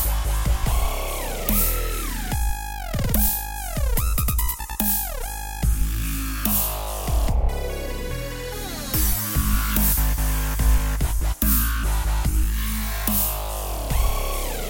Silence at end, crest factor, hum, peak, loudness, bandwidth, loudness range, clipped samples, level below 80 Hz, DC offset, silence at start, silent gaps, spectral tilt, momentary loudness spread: 0 s; 18 dB; none; -4 dBFS; -24 LUFS; 17 kHz; 3 LU; under 0.1%; -24 dBFS; under 0.1%; 0 s; none; -4 dB/octave; 9 LU